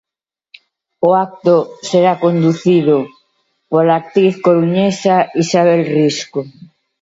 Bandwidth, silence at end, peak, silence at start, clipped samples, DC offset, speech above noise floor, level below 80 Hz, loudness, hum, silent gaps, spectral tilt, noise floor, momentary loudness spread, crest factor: 8 kHz; 0.5 s; 0 dBFS; 1 s; under 0.1%; under 0.1%; 64 dB; -62 dBFS; -13 LUFS; none; none; -6.5 dB/octave; -76 dBFS; 6 LU; 14 dB